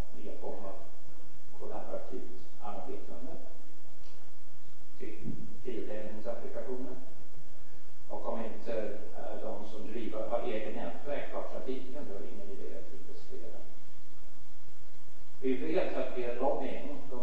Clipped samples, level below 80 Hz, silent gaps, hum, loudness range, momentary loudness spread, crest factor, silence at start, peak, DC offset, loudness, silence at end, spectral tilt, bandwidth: under 0.1%; -60 dBFS; none; none; 10 LU; 25 LU; 22 dB; 0 s; -14 dBFS; 8%; -40 LUFS; 0 s; -7 dB/octave; 8.4 kHz